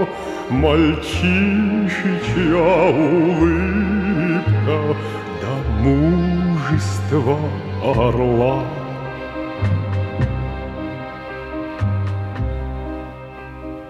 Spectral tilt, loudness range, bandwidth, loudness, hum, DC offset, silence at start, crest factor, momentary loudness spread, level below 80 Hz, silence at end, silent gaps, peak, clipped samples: -7.5 dB/octave; 8 LU; 12 kHz; -19 LUFS; none; under 0.1%; 0 s; 16 dB; 13 LU; -32 dBFS; 0 s; none; -2 dBFS; under 0.1%